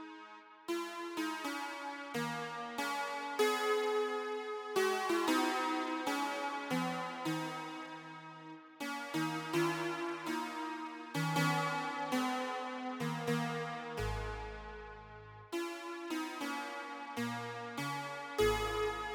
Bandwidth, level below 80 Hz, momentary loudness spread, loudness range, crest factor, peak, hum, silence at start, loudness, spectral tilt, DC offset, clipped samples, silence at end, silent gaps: 17.5 kHz; -56 dBFS; 13 LU; 7 LU; 18 dB; -20 dBFS; none; 0 s; -37 LUFS; -4.5 dB/octave; under 0.1%; under 0.1%; 0 s; none